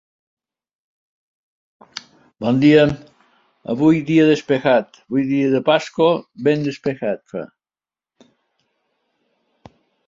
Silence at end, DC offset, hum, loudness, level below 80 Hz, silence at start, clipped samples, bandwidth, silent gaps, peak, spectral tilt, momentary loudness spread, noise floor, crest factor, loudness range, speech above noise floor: 2.6 s; under 0.1%; none; -17 LUFS; -58 dBFS; 1.95 s; under 0.1%; 7.6 kHz; none; -2 dBFS; -7 dB/octave; 20 LU; under -90 dBFS; 18 dB; 9 LU; over 73 dB